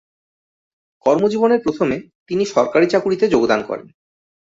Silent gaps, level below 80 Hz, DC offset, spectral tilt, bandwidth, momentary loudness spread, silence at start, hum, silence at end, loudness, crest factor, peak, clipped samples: 2.15-2.26 s; -56 dBFS; under 0.1%; -6 dB/octave; 7.8 kHz; 10 LU; 1.05 s; none; 0.7 s; -17 LUFS; 16 dB; -2 dBFS; under 0.1%